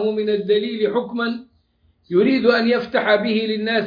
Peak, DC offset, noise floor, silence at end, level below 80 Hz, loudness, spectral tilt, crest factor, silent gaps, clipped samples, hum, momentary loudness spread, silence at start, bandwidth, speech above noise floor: -2 dBFS; under 0.1%; -61 dBFS; 0 s; -62 dBFS; -19 LUFS; -7.5 dB/octave; 16 dB; none; under 0.1%; none; 8 LU; 0 s; 5.2 kHz; 42 dB